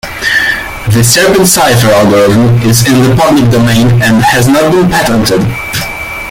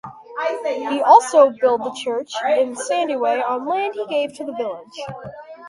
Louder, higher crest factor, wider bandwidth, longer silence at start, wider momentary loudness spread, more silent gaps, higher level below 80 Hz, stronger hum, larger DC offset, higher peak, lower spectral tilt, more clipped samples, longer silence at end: first, -7 LUFS vs -19 LUFS; second, 6 dB vs 20 dB; first, 17 kHz vs 11.5 kHz; about the same, 0.05 s vs 0.05 s; second, 8 LU vs 19 LU; neither; first, -30 dBFS vs -66 dBFS; neither; neither; about the same, 0 dBFS vs 0 dBFS; about the same, -4.5 dB/octave vs -3.5 dB/octave; first, 0.2% vs under 0.1%; about the same, 0 s vs 0 s